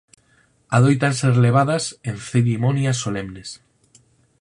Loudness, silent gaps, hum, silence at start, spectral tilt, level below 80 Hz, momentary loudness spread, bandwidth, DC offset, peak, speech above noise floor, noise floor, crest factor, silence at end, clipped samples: -19 LUFS; none; none; 0.7 s; -6 dB/octave; -54 dBFS; 14 LU; 11 kHz; under 0.1%; -2 dBFS; 41 dB; -59 dBFS; 18 dB; 0.85 s; under 0.1%